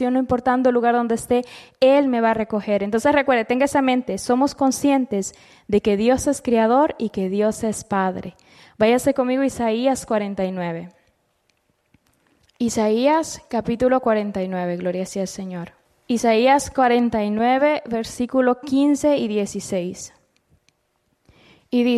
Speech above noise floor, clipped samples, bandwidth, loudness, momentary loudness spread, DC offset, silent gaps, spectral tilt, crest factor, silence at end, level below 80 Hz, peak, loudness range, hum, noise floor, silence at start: 49 dB; under 0.1%; 13.5 kHz; -20 LUFS; 9 LU; under 0.1%; none; -5 dB/octave; 14 dB; 0 s; -52 dBFS; -6 dBFS; 5 LU; none; -68 dBFS; 0 s